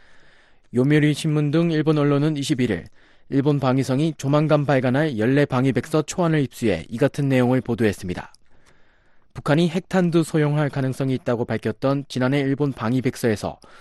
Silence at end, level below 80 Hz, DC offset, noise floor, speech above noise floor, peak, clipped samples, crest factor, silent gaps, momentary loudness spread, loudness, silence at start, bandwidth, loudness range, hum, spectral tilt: 0.05 s; -52 dBFS; under 0.1%; -53 dBFS; 32 dB; -6 dBFS; under 0.1%; 16 dB; none; 6 LU; -21 LUFS; 0.15 s; 12.5 kHz; 3 LU; none; -7 dB/octave